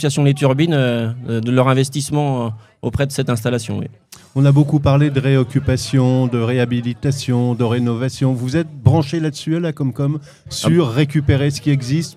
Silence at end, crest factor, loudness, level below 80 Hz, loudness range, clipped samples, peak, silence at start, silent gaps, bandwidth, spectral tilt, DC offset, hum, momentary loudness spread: 0.05 s; 16 dB; -17 LUFS; -42 dBFS; 3 LU; under 0.1%; 0 dBFS; 0 s; none; 13.5 kHz; -6.5 dB/octave; under 0.1%; none; 8 LU